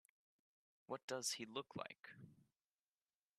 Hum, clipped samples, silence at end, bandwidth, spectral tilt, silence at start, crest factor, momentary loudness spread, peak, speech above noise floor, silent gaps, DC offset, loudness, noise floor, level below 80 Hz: none; under 0.1%; 0.95 s; 13 kHz; -2 dB/octave; 0.9 s; 24 dB; 18 LU; -30 dBFS; over 40 dB; 1.03-1.08 s; under 0.1%; -48 LUFS; under -90 dBFS; under -90 dBFS